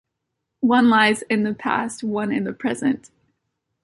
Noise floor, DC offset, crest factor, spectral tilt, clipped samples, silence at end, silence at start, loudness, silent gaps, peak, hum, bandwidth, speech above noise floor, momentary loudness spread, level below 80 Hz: -79 dBFS; under 0.1%; 18 dB; -4.5 dB/octave; under 0.1%; 0.85 s; 0.6 s; -20 LUFS; none; -4 dBFS; none; 11.5 kHz; 59 dB; 10 LU; -62 dBFS